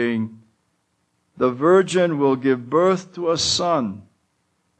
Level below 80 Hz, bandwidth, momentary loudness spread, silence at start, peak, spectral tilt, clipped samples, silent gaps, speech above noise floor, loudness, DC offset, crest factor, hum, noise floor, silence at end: -60 dBFS; 9.4 kHz; 10 LU; 0 s; -4 dBFS; -4.5 dB/octave; under 0.1%; none; 50 dB; -19 LUFS; under 0.1%; 16 dB; none; -69 dBFS; 0.8 s